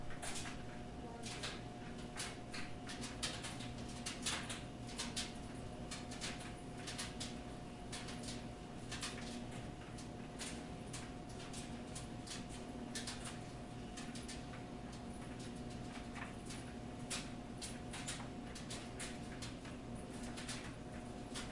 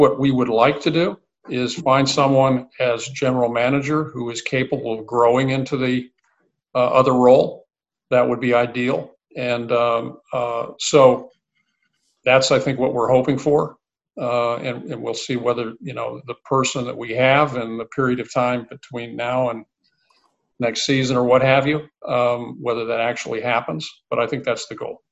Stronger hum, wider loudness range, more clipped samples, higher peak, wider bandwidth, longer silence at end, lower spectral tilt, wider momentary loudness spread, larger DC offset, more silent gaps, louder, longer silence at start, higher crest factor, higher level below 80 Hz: neither; about the same, 4 LU vs 4 LU; neither; second, -26 dBFS vs 0 dBFS; first, 11.5 kHz vs 8.4 kHz; second, 0 s vs 0.15 s; second, -3.5 dB/octave vs -5 dB/octave; second, 7 LU vs 12 LU; neither; neither; second, -47 LUFS vs -20 LUFS; about the same, 0 s vs 0 s; about the same, 20 dB vs 20 dB; about the same, -58 dBFS vs -58 dBFS